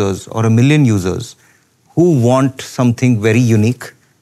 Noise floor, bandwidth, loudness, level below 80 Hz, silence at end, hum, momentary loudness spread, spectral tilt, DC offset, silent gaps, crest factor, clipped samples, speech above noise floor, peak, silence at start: -52 dBFS; 13.5 kHz; -13 LUFS; -52 dBFS; 0.3 s; none; 13 LU; -7 dB/octave; under 0.1%; none; 12 dB; under 0.1%; 39 dB; -2 dBFS; 0 s